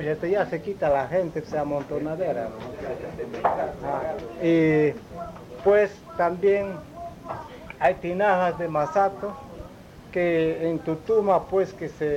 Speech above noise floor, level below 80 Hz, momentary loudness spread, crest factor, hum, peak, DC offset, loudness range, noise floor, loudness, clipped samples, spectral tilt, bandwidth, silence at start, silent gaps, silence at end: 20 dB; -52 dBFS; 16 LU; 16 dB; none; -8 dBFS; under 0.1%; 4 LU; -44 dBFS; -25 LUFS; under 0.1%; -7.5 dB/octave; 15.5 kHz; 0 s; none; 0 s